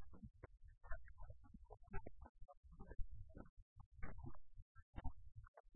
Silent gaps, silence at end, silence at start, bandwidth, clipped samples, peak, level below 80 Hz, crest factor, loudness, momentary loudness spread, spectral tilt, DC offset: 2.29-2.35 s, 2.57-2.63 s, 3.49-3.76 s, 3.86-3.92 s, 4.62-4.75 s, 4.82-4.93 s, 5.48-5.54 s, 5.60-5.64 s; 0 s; 0 s; 2.3 kHz; under 0.1%; -32 dBFS; -56 dBFS; 20 dB; -61 LUFS; 11 LU; -5 dB/octave; under 0.1%